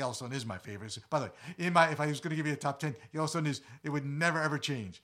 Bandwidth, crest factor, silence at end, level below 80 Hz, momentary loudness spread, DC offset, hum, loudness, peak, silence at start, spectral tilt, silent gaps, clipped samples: 14.5 kHz; 24 dB; 0.05 s; -74 dBFS; 13 LU; under 0.1%; none; -33 LUFS; -10 dBFS; 0 s; -5 dB/octave; none; under 0.1%